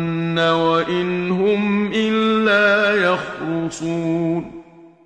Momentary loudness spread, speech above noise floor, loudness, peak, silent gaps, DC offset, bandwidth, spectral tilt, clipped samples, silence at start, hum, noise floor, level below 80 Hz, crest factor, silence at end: 9 LU; 23 dB; -18 LUFS; -4 dBFS; none; under 0.1%; 9.8 kHz; -6 dB/octave; under 0.1%; 0 s; none; -41 dBFS; -54 dBFS; 14 dB; 0.2 s